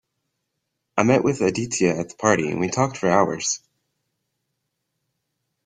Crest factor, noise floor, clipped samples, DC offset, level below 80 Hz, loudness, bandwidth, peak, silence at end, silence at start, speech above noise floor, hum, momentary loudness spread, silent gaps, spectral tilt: 22 dB; -78 dBFS; under 0.1%; under 0.1%; -58 dBFS; -21 LUFS; 9.8 kHz; -2 dBFS; 2.1 s; 0.95 s; 58 dB; none; 6 LU; none; -4.5 dB/octave